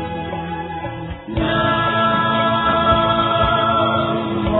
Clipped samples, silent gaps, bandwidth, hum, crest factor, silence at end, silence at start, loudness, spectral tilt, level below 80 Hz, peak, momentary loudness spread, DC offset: under 0.1%; none; 4.4 kHz; none; 16 dB; 0 s; 0 s; -17 LUFS; -11 dB/octave; -36 dBFS; -2 dBFS; 11 LU; under 0.1%